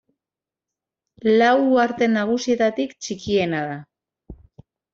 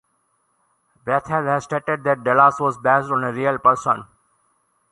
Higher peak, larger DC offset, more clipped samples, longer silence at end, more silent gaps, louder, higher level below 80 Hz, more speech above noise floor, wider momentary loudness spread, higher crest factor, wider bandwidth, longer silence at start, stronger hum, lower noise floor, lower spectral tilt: about the same, -4 dBFS vs -2 dBFS; neither; neither; second, 0.6 s vs 0.9 s; neither; about the same, -20 LUFS vs -19 LUFS; about the same, -56 dBFS vs -60 dBFS; first, 70 dB vs 48 dB; first, 12 LU vs 8 LU; about the same, 18 dB vs 20 dB; second, 7.8 kHz vs 11.5 kHz; first, 1.25 s vs 1.05 s; neither; first, -89 dBFS vs -67 dBFS; second, -5 dB/octave vs -6.5 dB/octave